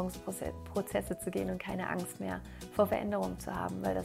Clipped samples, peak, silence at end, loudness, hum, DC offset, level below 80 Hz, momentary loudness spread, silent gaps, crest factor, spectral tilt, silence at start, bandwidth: under 0.1%; -16 dBFS; 0 s; -36 LUFS; none; under 0.1%; -54 dBFS; 9 LU; none; 20 dB; -5.5 dB/octave; 0 s; 16 kHz